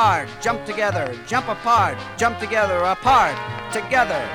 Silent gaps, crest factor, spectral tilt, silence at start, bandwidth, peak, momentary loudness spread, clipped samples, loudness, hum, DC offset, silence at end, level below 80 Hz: none; 16 dB; -4 dB/octave; 0 s; 16.5 kHz; -4 dBFS; 8 LU; under 0.1%; -20 LUFS; none; under 0.1%; 0 s; -46 dBFS